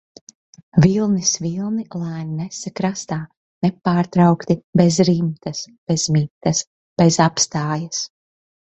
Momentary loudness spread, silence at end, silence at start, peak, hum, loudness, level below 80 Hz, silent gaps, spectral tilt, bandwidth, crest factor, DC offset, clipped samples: 13 LU; 0.6 s; 0.75 s; -2 dBFS; none; -19 LUFS; -52 dBFS; 3.37-3.61 s, 4.64-4.73 s, 5.78-5.87 s, 6.30-6.41 s, 6.67-6.96 s; -5 dB/octave; 8.2 kHz; 18 dB; under 0.1%; under 0.1%